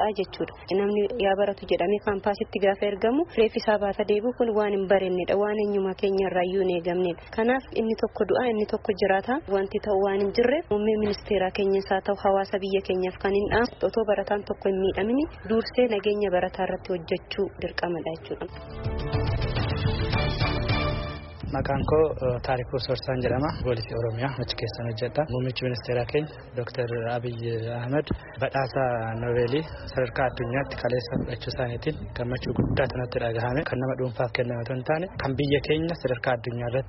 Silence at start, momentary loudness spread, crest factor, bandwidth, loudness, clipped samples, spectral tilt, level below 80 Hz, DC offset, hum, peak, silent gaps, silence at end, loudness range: 0 s; 7 LU; 18 dB; 6 kHz; -26 LUFS; under 0.1%; -5 dB/octave; -42 dBFS; under 0.1%; none; -8 dBFS; none; 0 s; 4 LU